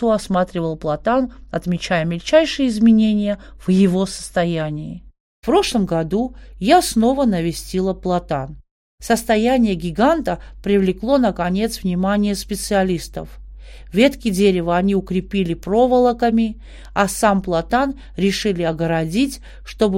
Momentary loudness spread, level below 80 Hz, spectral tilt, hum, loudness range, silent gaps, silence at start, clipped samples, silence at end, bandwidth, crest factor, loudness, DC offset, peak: 10 LU; -38 dBFS; -5.5 dB/octave; none; 2 LU; 5.20-5.42 s, 8.71-8.98 s; 0 s; under 0.1%; 0 s; 16.5 kHz; 18 dB; -18 LUFS; under 0.1%; 0 dBFS